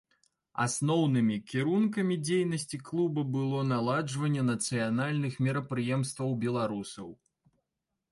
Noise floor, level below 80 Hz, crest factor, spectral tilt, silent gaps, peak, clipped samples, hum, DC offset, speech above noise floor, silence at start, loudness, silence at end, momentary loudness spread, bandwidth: -85 dBFS; -70 dBFS; 14 dB; -6 dB/octave; none; -16 dBFS; under 0.1%; none; under 0.1%; 56 dB; 0.55 s; -30 LUFS; 1 s; 7 LU; 11.5 kHz